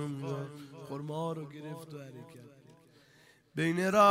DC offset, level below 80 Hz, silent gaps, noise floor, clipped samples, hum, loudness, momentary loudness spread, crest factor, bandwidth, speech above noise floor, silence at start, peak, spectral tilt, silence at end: under 0.1%; -74 dBFS; none; -63 dBFS; under 0.1%; none; -34 LUFS; 20 LU; 22 dB; 16 kHz; 32 dB; 0 s; -12 dBFS; -6 dB/octave; 0 s